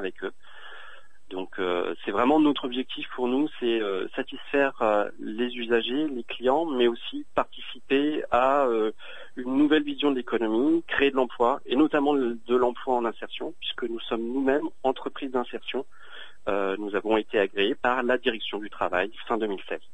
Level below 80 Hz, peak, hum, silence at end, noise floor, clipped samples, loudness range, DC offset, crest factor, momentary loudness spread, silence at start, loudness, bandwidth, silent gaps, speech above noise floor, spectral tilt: -58 dBFS; -8 dBFS; none; 0.15 s; -51 dBFS; under 0.1%; 4 LU; 1%; 18 dB; 12 LU; 0 s; -26 LUFS; 8.8 kHz; none; 25 dB; -6 dB/octave